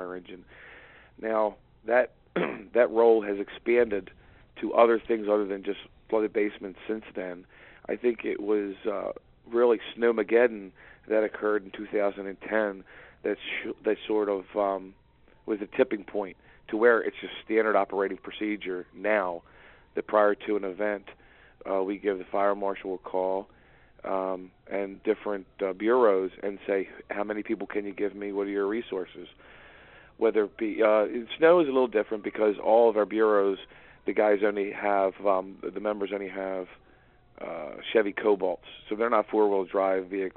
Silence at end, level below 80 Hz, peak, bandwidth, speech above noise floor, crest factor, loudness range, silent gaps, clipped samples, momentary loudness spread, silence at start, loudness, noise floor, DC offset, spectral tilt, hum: 0.05 s; -64 dBFS; -6 dBFS; 4.2 kHz; 31 dB; 22 dB; 6 LU; none; under 0.1%; 15 LU; 0 s; -27 LUFS; -59 dBFS; under 0.1%; -3.5 dB/octave; none